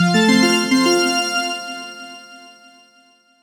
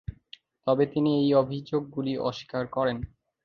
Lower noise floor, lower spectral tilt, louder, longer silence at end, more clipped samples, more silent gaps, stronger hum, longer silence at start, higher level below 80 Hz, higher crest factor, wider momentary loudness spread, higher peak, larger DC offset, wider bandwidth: about the same, -54 dBFS vs -54 dBFS; second, -4 dB/octave vs -8 dB/octave; first, -16 LUFS vs -27 LUFS; first, 1 s vs 0.4 s; neither; neither; neither; about the same, 0 s vs 0.1 s; second, -66 dBFS vs -52 dBFS; about the same, 16 dB vs 18 dB; first, 21 LU vs 12 LU; first, -2 dBFS vs -10 dBFS; neither; first, 18 kHz vs 6.8 kHz